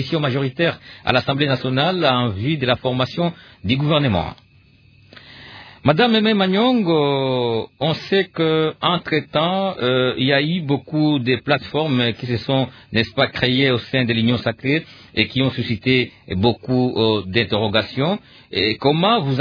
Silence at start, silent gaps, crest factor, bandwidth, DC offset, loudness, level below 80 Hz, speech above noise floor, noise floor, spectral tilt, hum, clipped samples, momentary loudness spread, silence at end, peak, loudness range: 0 s; none; 18 dB; 5.4 kHz; under 0.1%; -19 LUFS; -50 dBFS; 33 dB; -51 dBFS; -8 dB/octave; none; under 0.1%; 6 LU; 0 s; 0 dBFS; 2 LU